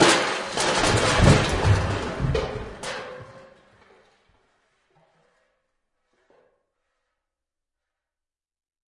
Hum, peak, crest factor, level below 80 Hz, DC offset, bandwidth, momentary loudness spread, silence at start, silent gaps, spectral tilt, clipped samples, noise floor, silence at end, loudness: none; -4 dBFS; 22 dB; -38 dBFS; under 0.1%; 11.5 kHz; 16 LU; 0 s; none; -4.5 dB/octave; under 0.1%; -90 dBFS; 5.6 s; -22 LUFS